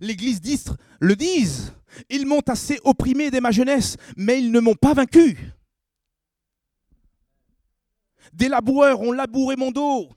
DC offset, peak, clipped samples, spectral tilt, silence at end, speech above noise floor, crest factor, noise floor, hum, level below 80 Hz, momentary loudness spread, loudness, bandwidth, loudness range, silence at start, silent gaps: under 0.1%; -2 dBFS; under 0.1%; -5.5 dB/octave; 0.1 s; 64 dB; 20 dB; -83 dBFS; none; -44 dBFS; 11 LU; -19 LUFS; 15 kHz; 5 LU; 0 s; none